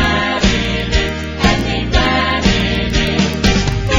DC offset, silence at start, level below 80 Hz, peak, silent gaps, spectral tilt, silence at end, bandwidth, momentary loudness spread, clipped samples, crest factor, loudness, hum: under 0.1%; 0 s; -22 dBFS; 0 dBFS; none; -4.5 dB/octave; 0 s; 16 kHz; 3 LU; under 0.1%; 14 dB; -15 LUFS; none